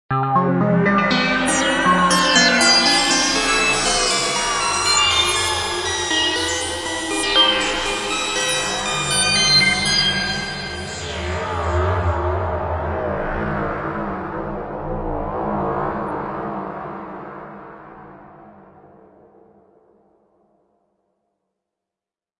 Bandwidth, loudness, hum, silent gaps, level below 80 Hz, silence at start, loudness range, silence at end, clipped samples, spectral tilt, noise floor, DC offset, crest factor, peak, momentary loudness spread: 12 kHz; -18 LUFS; none; none; -40 dBFS; 0.1 s; 12 LU; 3.9 s; under 0.1%; -2.5 dB/octave; -89 dBFS; under 0.1%; 20 dB; -2 dBFS; 14 LU